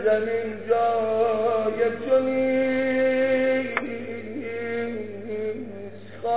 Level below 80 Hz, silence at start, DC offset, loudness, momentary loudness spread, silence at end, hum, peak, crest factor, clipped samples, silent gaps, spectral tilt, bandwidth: -60 dBFS; 0 s; 0.6%; -24 LUFS; 12 LU; 0 s; none; -6 dBFS; 18 dB; under 0.1%; none; -9.5 dB/octave; 4 kHz